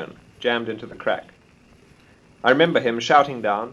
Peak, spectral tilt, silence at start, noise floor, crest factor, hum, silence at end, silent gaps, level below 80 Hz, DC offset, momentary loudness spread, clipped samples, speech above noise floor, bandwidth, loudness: -2 dBFS; -5 dB/octave; 0 s; -53 dBFS; 20 dB; none; 0 s; none; -60 dBFS; under 0.1%; 11 LU; under 0.1%; 33 dB; 10.5 kHz; -21 LUFS